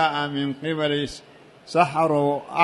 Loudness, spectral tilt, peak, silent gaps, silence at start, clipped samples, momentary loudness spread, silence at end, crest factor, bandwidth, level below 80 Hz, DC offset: -23 LUFS; -5.5 dB/octave; -4 dBFS; none; 0 s; under 0.1%; 7 LU; 0 s; 20 dB; 11.5 kHz; -58 dBFS; under 0.1%